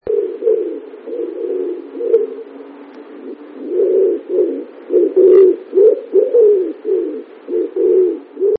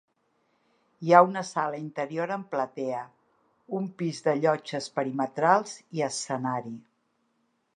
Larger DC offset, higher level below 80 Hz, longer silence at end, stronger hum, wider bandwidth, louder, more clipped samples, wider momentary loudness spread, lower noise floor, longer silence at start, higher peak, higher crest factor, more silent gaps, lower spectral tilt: neither; first, -66 dBFS vs -82 dBFS; second, 0 s vs 0.95 s; neither; second, 3.7 kHz vs 11 kHz; first, -15 LUFS vs -27 LUFS; neither; first, 20 LU vs 16 LU; second, -35 dBFS vs -73 dBFS; second, 0.05 s vs 1 s; first, 0 dBFS vs -4 dBFS; second, 14 dB vs 26 dB; neither; first, -10 dB/octave vs -5 dB/octave